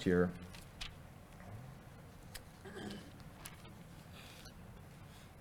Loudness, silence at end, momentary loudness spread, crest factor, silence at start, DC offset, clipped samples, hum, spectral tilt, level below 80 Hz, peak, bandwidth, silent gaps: -47 LUFS; 0 s; 12 LU; 24 dB; 0 s; under 0.1%; under 0.1%; none; -6 dB/octave; -62 dBFS; -18 dBFS; 19 kHz; none